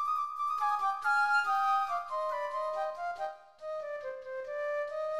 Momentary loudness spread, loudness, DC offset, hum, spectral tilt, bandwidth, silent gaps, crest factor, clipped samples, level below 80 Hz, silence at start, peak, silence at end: 13 LU; -32 LUFS; 0.1%; none; -0.5 dB/octave; 13.5 kHz; none; 14 dB; under 0.1%; -74 dBFS; 0 s; -18 dBFS; 0 s